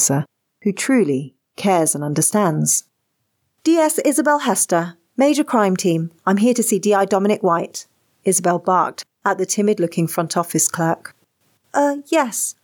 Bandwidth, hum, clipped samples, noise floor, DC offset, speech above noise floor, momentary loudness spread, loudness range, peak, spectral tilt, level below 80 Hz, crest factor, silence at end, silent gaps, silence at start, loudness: 19.5 kHz; none; under 0.1%; -71 dBFS; under 0.1%; 54 dB; 8 LU; 2 LU; -4 dBFS; -4.5 dB/octave; -78 dBFS; 14 dB; 0.1 s; none; 0 s; -18 LUFS